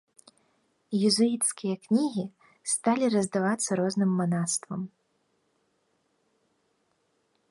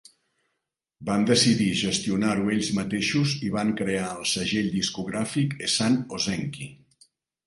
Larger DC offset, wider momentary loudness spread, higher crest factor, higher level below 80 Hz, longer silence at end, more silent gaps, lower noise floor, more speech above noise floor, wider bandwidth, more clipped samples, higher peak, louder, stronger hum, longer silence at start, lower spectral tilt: neither; first, 13 LU vs 8 LU; about the same, 18 dB vs 18 dB; second, -74 dBFS vs -56 dBFS; first, 2.65 s vs 0.7 s; neither; second, -73 dBFS vs -82 dBFS; second, 46 dB vs 57 dB; about the same, 11.5 kHz vs 11.5 kHz; neither; second, -12 dBFS vs -8 dBFS; about the same, -27 LUFS vs -25 LUFS; neither; about the same, 0.9 s vs 1 s; about the same, -4.5 dB/octave vs -4 dB/octave